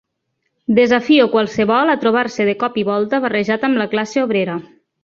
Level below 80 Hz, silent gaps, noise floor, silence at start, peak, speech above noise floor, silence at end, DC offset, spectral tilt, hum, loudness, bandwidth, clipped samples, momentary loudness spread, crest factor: -58 dBFS; none; -72 dBFS; 0.7 s; 0 dBFS; 56 dB; 0.4 s; under 0.1%; -5.5 dB/octave; none; -16 LUFS; 7.4 kHz; under 0.1%; 6 LU; 16 dB